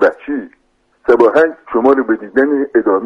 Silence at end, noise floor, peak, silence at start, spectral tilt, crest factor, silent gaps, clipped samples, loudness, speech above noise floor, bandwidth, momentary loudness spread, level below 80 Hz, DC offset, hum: 0 s; -59 dBFS; 0 dBFS; 0 s; -7 dB/octave; 14 dB; none; under 0.1%; -13 LUFS; 46 dB; 7 kHz; 13 LU; -52 dBFS; under 0.1%; none